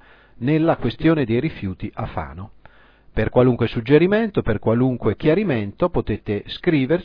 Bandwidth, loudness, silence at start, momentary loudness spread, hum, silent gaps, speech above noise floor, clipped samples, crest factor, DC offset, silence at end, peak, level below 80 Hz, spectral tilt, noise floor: 5.2 kHz; -20 LUFS; 0.4 s; 12 LU; none; none; 30 dB; under 0.1%; 16 dB; under 0.1%; 0 s; -4 dBFS; -38 dBFS; -10.5 dB/octave; -49 dBFS